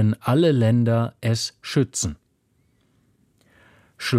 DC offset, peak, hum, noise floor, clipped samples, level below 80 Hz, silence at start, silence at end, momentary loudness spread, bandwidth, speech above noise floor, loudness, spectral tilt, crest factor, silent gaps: under 0.1%; -8 dBFS; none; -65 dBFS; under 0.1%; -52 dBFS; 0 s; 0 s; 10 LU; 14 kHz; 45 dB; -22 LUFS; -5.5 dB/octave; 16 dB; none